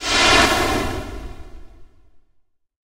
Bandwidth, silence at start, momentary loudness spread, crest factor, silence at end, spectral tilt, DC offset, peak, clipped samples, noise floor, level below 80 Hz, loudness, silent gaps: 16 kHz; 0 s; 23 LU; 18 dB; 0.7 s; -2.5 dB/octave; under 0.1%; -2 dBFS; under 0.1%; -61 dBFS; -34 dBFS; -16 LUFS; none